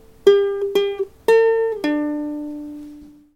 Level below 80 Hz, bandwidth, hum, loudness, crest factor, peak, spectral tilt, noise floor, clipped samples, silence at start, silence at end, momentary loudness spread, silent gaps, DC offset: -56 dBFS; 15.5 kHz; none; -19 LUFS; 18 dB; -2 dBFS; -4.5 dB/octave; -41 dBFS; under 0.1%; 0.25 s; 0.3 s; 18 LU; none; under 0.1%